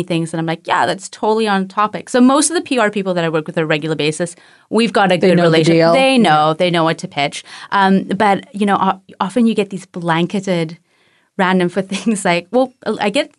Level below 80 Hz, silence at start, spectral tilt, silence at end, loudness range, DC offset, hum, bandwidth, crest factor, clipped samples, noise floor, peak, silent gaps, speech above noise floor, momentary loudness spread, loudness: -64 dBFS; 0 s; -5 dB/octave; 0.1 s; 5 LU; under 0.1%; none; 12 kHz; 12 dB; under 0.1%; -57 dBFS; -2 dBFS; none; 42 dB; 9 LU; -15 LUFS